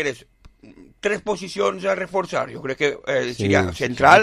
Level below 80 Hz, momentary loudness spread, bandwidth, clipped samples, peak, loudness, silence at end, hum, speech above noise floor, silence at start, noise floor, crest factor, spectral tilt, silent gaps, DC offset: -46 dBFS; 8 LU; 14.5 kHz; under 0.1%; 0 dBFS; -22 LUFS; 0 s; none; 27 dB; 0 s; -47 dBFS; 20 dB; -4.5 dB/octave; none; under 0.1%